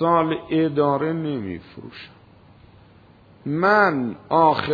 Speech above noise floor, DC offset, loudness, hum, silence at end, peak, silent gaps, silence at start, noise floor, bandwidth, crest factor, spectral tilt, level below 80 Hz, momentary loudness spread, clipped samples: 30 dB; under 0.1%; -20 LUFS; none; 0 s; -4 dBFS; none; 0 s; -50 dBFS; 5 kHz; 18 dB; -8.5 dB/octave; -58 dBFS; 21 LU; under 0.1%